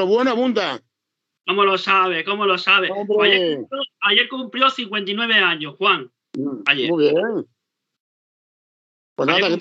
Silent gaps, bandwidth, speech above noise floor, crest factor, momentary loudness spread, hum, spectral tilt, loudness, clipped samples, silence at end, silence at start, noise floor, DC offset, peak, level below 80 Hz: 8.00-9.16 s; 7.8 kHz; 62 dB; 20 dB; 11 LU; none; -4.5 dB/octave; -18 LUFS; under 0.1%; 0 s; 0 s; -80 dBFS; under 0.1%; 0 dBFS; under -90 dBFS